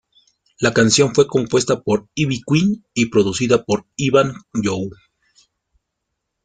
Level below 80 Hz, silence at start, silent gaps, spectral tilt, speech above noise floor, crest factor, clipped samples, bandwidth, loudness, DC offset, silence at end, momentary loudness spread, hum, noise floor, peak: -52 dBFS; 0.6 s; none; -4.5 dB/octave; 60 dB; 18 dB; under 0.1%; 9.6 kHz; -18 LUFS; under 0.1%; 1.5 s; 9 LU; none; -77 dBFS; -2 dBFS